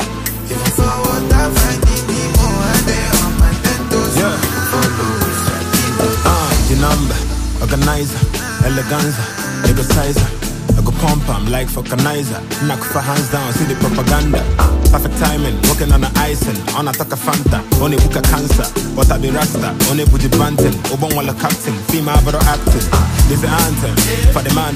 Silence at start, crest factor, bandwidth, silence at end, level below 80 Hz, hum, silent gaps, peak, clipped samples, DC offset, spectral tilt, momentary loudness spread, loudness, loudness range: 0 s; 14 dB; 15.5 kHz; 0 s; -18 dBFS; none; none; 0 dBFS; under 0.1%; under 0.1%; -4.5 dB/octave; 5 LU; -15 LUFS; 2 LU